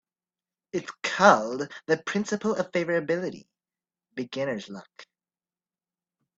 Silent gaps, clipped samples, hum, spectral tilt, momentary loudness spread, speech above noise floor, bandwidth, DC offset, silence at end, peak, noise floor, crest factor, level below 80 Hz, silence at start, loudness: none; under 0.1%; none; -4.5 dB/octave; 17 LU; over 64 dB; 8 kHz; under 0.1%; 1.35 s; -2 dBFS; under -90 dBFS; 28 dB; -72 dBFS; 0.75 s; -26 LUFS